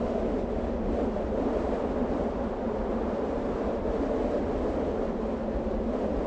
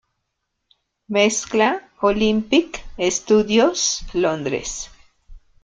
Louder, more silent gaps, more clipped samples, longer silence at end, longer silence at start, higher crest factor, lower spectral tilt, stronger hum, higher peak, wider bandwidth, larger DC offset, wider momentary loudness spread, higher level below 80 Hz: second, -30 LUFS vs -19 LUFS; neither; neither; second, 0 s vs 0.25 s; second, 0 s vs 1.1 s; about the same, 14 dB vs 18 dB; first, -8.5 dB/octave vs -3 dB/octave; neither; second, -16 dBFS vs -4 dBFS; second, 8 kHz vs 9.4 kHz; neither; second, 2 LU vs 9 LU; first, -38 dBFS vs -44 dBFS